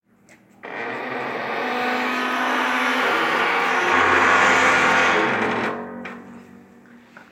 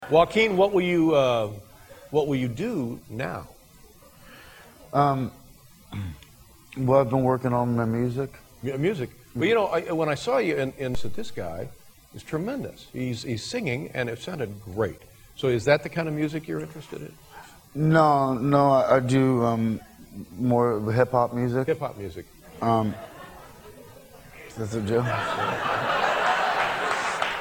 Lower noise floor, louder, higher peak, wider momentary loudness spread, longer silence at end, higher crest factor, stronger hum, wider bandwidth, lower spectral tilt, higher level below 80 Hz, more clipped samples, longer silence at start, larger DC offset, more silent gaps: about the same, -53 dBFS vs -52 dBFS; first, -19 LUFS vs -25 LUFS; about the same, -4 dBFS vs -4 dBFS; about the same, 16 LU vs 18 LU; about the same, 0.1 s vs 0 s; about the same, 18 dB vs 20 dB; neither; about the same, 16 kHz vs 17 kHz; second, -3 dB/octave vs -6.5 dB/octave; second, -60 dBFS vs -52 dBFS; neither; first, 0.65 s vs 0 s; neither; neither